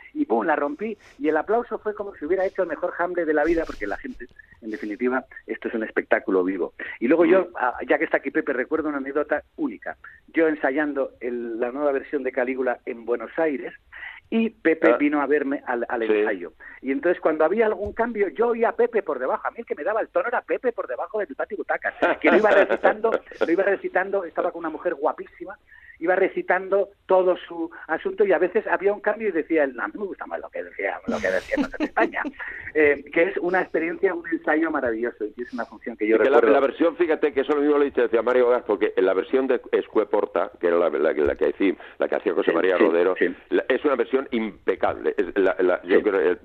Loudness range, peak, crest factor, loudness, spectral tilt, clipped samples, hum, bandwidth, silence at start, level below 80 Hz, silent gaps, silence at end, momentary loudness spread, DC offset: 5 LU; -4 dBFS; 20 dB; -23 LUFS; -6.5 dB/octave; under 0.1%; none; 7.2 kHz; 0.15 s; -56 dBFS; none; 0.05 s; 11 LU; under 0.1%